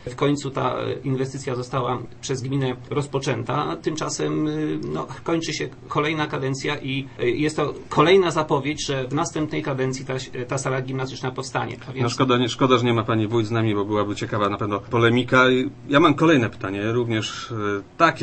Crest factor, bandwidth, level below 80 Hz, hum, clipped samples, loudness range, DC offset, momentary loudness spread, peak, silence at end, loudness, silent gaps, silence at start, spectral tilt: 20 dB; 8.8 kHz; -52 dBFS; none; under 0.1%; 6 LU; under 0.1%; 10 LU; -2 dBFS; 0 s; -23 LUFS; none; 0 s; -5.5 dB/octave